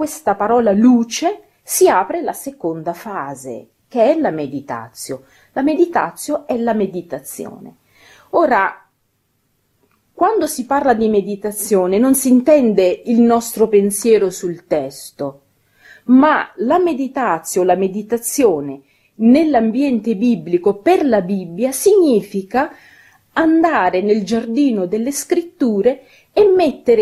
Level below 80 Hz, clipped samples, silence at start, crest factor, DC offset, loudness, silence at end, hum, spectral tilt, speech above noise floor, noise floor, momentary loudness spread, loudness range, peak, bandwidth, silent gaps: -56 dBFS; under 0.1%; 0 s; 14 dB; under 0.1%; -16 LUFS; 0 s; none; -5 dB/octave; 50 dB; -65 dBFS; 15 LU; 6 LU; 0 dBFS; 14.5 kHz; none